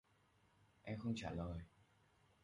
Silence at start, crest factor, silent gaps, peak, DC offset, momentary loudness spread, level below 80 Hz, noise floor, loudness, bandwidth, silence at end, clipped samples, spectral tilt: 0.85 s; 18 dB; none; -32 dBFS; under 0.1%; 14 LU; -62 dBFS; -76 dBFS; -47 LUFS; 11 kHz; 0.75 s; under 0.1%; -6.5 dB/octave